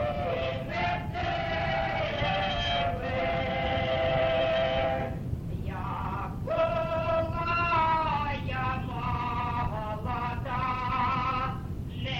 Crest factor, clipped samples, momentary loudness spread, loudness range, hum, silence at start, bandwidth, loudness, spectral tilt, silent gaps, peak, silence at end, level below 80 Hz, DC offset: 14 dB; under 0.1%; 8 LU; 3 LU; none; 0 s; 16.5 kHz; -29 LUFS; -7 dB/octave; none; -16 dBFS; 0 s; -42 dBFS; under 0.1%